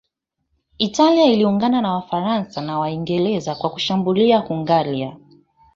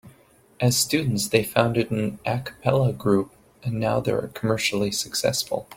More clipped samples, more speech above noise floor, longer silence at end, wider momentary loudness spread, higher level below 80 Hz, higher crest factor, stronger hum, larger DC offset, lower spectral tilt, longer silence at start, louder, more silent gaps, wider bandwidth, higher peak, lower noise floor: neither; first, 57 dB vs 32 dB; first, 0.6 s vs 0 s; first, 10 LU vs 6 LU; about the same, -58 dBFS vs -54 dBFS; second, 16 dB vs 22 dB; neither; neither; first, -6 dB/octave vs -4.5 dB/octave; first, 0.8 s vs 0.05 s; first, -19 LUFS vs -23 LUFS; neither; second, 7.8 kHz vs 16.5 kHz; about the same, -2 dBFS vs -2 dBFS; first, -75 dBFS vs -56 dBFS